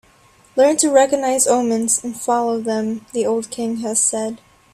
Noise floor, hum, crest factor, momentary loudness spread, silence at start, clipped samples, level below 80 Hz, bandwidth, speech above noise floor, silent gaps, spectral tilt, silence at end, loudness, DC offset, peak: -52 dBFS; none; 18 dB; 10 LU; 0.55 s; under 0.1%; -60 dBFS; 15 kHz; 34 dB; none; -3 dB/octave; 0.4 s; -18 LUFS; under 0.1%; -2 dBFS